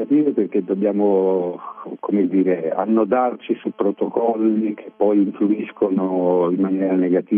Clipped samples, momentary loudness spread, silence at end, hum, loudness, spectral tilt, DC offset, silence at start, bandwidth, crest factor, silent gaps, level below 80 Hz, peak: under 0.1%; 6 LU; 0 s; none; -19 LUFS; -11.5 dB/octave; under 0.1%; 0 s; 3.6 kHz; 14 dB; none; -70 dBFS; -4 dBFS